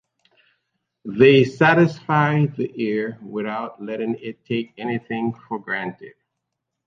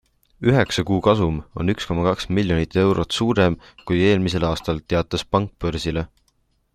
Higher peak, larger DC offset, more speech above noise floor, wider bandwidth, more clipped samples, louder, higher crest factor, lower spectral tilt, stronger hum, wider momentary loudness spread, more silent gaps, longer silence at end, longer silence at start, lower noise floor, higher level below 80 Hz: about the same, -2 dBFS vs -2 dBFS; neither; first, 60 dB vs 45 dB; second, 7.4 kHz vs 13.5 kHz; neither; about the same, -21 LUFS vs -21 LUFS; about the same, 20 dB vs 18 dB; first, -7.5 dB/octave vs -6 dB/octave; neither; first, 15 LU vs 7 LU; neither; about the same, 0.75 s vs 0.7 s; first, 1.05 s vs 0.4 s; first, -80 dBFS vs -65 dBFS; second, -62 dBFS vs -40 dBFS